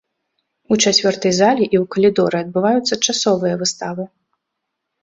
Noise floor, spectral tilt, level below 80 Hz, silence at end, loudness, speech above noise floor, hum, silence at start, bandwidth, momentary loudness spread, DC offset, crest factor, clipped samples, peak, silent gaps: -77 dBFS; -3.5 dB/octave; -58 dBFS; 0.95 s; -16 LUFS; 61 dB; none; 0.7 s; 8.2 kHz; 9 LU; under 0.1%; 16 dB; under 0.1%; -2 dBFS; none